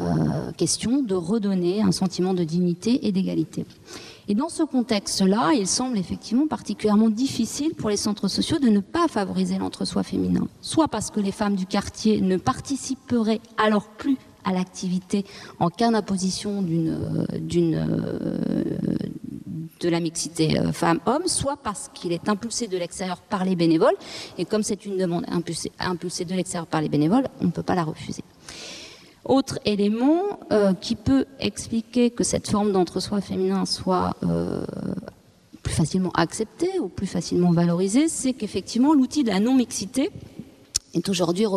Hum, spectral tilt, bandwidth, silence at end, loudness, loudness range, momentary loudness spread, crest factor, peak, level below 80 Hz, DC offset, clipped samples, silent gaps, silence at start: none; -5.5 dB/octave; 13.5 kHz; 0 s; -24 LUFS; 3 LU; 9 LU; 22 dB; 0 dBFS; -52 dBFS; under 0.1%; under 0.1%; none; 0 s